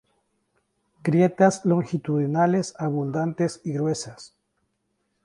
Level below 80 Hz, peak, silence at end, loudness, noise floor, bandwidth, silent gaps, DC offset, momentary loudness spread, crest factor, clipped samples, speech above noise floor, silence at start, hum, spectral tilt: -66 dBFS; -6 dBFS; 1 s; -23 LUFS; -74 dBFS; 11 kHz; none; under 0.1%; 8 LU; 18 dB; under 0.1%; 51 dB; 1.05 s; none; -7 dB/octave